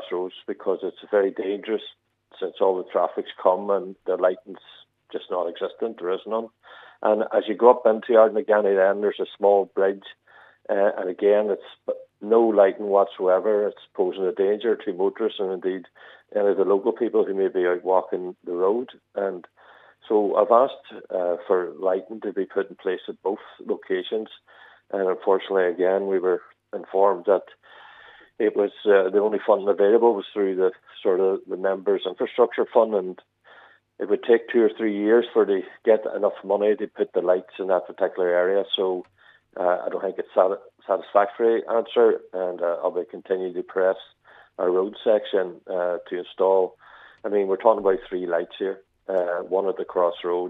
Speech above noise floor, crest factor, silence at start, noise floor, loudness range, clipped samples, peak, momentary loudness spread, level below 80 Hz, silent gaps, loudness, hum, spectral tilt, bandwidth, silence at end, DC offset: 30 dB; 22 dB; 0 s; -53 dBFS; 5 LU; under 0.1%; -2 dBFS; 11 LU; -72 dBFS; none; -23 LUFS; none; -8 dB/octave; 4 kHz; 0 s; under 0.1%